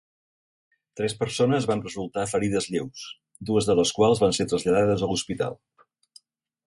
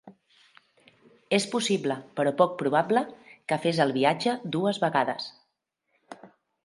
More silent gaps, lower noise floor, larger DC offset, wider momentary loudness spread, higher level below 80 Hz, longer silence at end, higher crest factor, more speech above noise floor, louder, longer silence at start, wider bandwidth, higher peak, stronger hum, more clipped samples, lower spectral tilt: neither; second, -57 dBFS vs -78 dBFS; neither; first, 12 LU vs 8 LU; first, -54 dBFS vs -76 dBFS; first, 1.15 s vs 0.4 s; second, 16 dB vs 22 dB; second, 33 dB vs 53 dB; about the same, -24 LUFS vs -26 LUFS; first, 0.95 s vs 0.05 s; about the same, 11.5 kHz vs 11.5 kHz; about the same, -8 dBFS vs -6 dBFS; neither; neither; about the same, -5 dB/octave vs -5 dB/octave